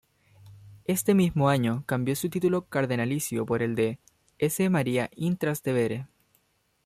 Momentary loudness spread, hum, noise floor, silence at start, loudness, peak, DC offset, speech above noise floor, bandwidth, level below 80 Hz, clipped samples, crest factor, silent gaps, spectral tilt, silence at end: 7 LU; none; -70 dBFS; 0.45 s; -27 LUFS; -10 dBFS; under 0.1%; 44 dB; 15.5 kHz; -60 dBFS; under 0.1%; 16 dB; none; -6 dB/octave; 0.8 s